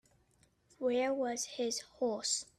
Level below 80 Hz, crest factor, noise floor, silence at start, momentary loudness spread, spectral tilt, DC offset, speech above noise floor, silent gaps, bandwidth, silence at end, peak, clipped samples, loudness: -76 dBFS; 16 dB; -71 dBFS; 0.8 s; 4 LU; -1.5 dB/octave; under 0.1%; 36 dB; none; 13.5 kHz; 0.15 s; -22 dBFS; under 0.1%; -35 LUFS